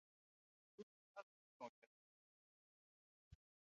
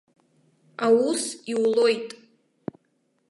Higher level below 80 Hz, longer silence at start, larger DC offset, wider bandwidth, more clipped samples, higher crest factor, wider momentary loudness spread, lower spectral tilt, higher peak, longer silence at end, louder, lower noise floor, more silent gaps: second, -84 dBFS vs -78 dBFS; about the same, 0.8 s vs 0.8 s; neither; second, 7 kHz vs 11.5 kHz; neither; first, 26 dB vs 18 dB; second, 5 LU vs 19 LU; about the same, -4.5 dB/octave vs -3.5 dB/octave; second, -40 dBFS vs -8 dBFS; second, 0.4 s vs 1.15 s; second, -62 LUFS vs -23 LUFS; first, under -90 dBFS vs -70 dBFS; first, 0.83-1.15 s, 1.23-1.60 s, 1.69-3.31 s vs none